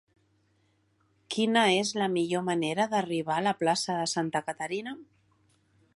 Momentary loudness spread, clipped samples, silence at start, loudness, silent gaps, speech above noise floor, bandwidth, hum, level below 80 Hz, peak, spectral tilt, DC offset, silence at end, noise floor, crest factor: 10 LU; under 0.1%; 1.3 s; -28 LUFS; none; 42 dB; 11.5 kHz; none; -76 dBFS; -10 dBFS; -4 dB/octave; under 0.1%; 0.9 s; -70 dBFS; 20 dB